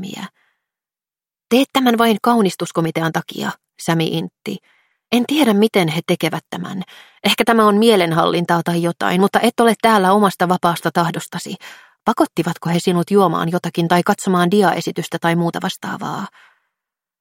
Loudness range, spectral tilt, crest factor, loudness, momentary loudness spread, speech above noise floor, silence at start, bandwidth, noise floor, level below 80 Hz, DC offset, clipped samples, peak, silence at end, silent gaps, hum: 4 LU; -5.5 dB/octave; 18 dB; -17 LUFS; 14 LU; over 73 dB; 0 s; 17 kHz; under -90 dBFS; -62 dBFS; under 0.1%; under 0.1%; 0 dBFS; 0.9 s; none; none